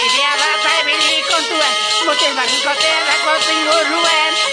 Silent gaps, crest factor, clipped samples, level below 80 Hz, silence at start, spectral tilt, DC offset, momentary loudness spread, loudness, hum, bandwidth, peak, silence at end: none; 14 dB; under 0.1%; -64 dBFS; 0 s; 1 dB/octave; under 0.1%; 2 LU; -13 LUFS; none; 10.5 kHz; 0 dBFS; 0 s